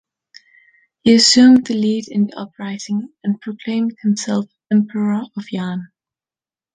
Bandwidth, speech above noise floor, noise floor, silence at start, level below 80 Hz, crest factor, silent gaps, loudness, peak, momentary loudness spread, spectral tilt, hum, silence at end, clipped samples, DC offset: 9.6 kHz; over 74 dB; under -90 dBFS; 1.05 s; -62 dBFS; 16 dB; none; -16 LUFS; 0 dBFS; 16 LU; -4 dB/octave; none; 0.9 s; under 0.1%; under 0.1%